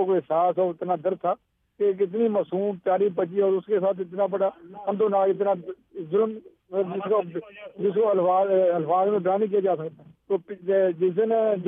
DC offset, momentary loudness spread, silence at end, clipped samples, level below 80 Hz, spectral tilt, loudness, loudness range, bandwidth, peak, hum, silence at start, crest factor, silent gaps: under 0.1%; 8 LU; 0 s; under 0.1%; -74 dBFS; -11 dB/octave; -24 LUFS; 3 LU; 3.7 kHz; -10 dBFS; none; 0 s; 14 dB; none